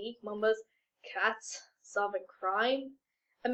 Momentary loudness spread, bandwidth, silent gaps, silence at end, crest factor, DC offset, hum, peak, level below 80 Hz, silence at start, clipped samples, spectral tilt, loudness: 13 LU; 9 kHz; none; 0 s; 20 dB; under 0.1%; none; -16 dBFS; -82 dBFS; 0 s; under 0.1%; -2.5 dB/octave; -34 LUFS